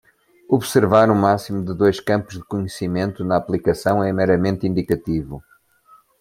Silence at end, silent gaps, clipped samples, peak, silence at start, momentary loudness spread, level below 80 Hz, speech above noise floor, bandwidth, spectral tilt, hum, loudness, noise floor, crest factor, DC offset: 0.8 s; none; under 0.1%; -2 dBFS; 0.5 s; 11 LU; -48 dBFS; 35 dB; 16.5 kHz; -6.5 dB/octave; none; -19 LUFS; -53 dBFS; 18 dB; under 0.1%